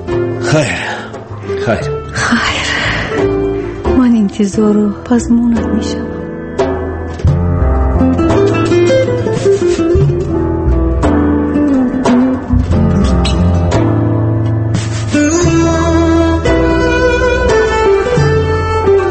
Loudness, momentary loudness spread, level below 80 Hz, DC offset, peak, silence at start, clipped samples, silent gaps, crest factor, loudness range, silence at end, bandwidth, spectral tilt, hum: -12 LUFS; 6 LU; -22 dBFS; under 0.1%; 0 dBFS; 0 s; under 0.1%; none; 12 dB; 3 LU; 0 s; 8.8 kHz; -6.5 dB/octave; none